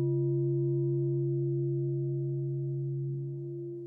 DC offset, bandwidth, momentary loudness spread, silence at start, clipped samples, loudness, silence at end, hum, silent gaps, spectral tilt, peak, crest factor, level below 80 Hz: under 0.1%; 1 kHz; 7 LU; 0 s; under 0.1%; -32 LUFS; 0 s; none; none; -15.5 dB/octave; -22 dBFS; 8 dB; -84 dBFS